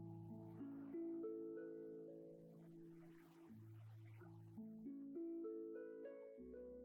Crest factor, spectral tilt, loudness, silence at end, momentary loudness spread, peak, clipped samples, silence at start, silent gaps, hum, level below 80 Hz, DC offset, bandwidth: 12 dB; -10 dB/octave; -55 LUFS; 0 s; 12 LU; -42 dBFS; under 0.1%; 0 s; none; none; -84 dBFS; under 0.1%; 16 kHz